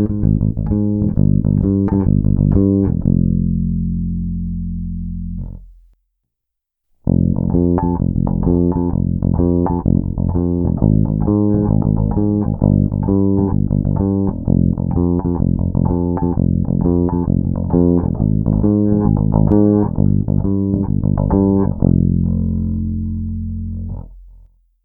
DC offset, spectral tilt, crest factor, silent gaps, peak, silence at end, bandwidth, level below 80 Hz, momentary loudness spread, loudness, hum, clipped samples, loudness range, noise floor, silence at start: under 0.1%; -15.5 dB/octave; 16 dB; none; 0 dBFS; 0.45 s; 1.9 kHz; -26 dBFS; 8 LU; -16 LUFS; none; under 0.1%; 5 LU; -79 dBFS; 0 s